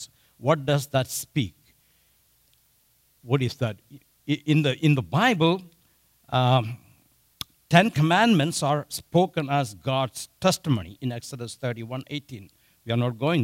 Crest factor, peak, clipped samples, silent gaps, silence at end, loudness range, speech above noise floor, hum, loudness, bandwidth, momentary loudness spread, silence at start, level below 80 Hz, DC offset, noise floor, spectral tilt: 22 dB; -4 dBFS; under 0.1%; none; 0 s; 6 LU; 40 dB; none; -24 LUFS; 16 kHz; 16 LU; 0 s; -60 dBFS; under 0.1%; -64 dBFS; -5.5 dB/octave